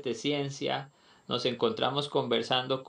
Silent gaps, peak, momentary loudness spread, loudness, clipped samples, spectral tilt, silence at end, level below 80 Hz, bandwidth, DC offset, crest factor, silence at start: none; -12 dBFS; 7 LU; -30 LUFS; under 0.1%; -4.5 dB/octave; 0 s; -76 dBFS; 10 kHz; under 0.1%; 20 dB; 0 s